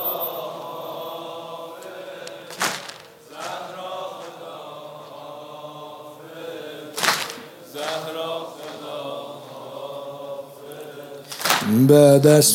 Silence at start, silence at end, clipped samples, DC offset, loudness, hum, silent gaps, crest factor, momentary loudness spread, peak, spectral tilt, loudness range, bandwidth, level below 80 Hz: 0 s; 0 s; under 0.1%; under 0.1%; -21 LUFS; none; none; 22 dB; 21 LU; 0 dBFS; -4.5 dB/octave; 13 LU; 17 kHz; -70 dBFS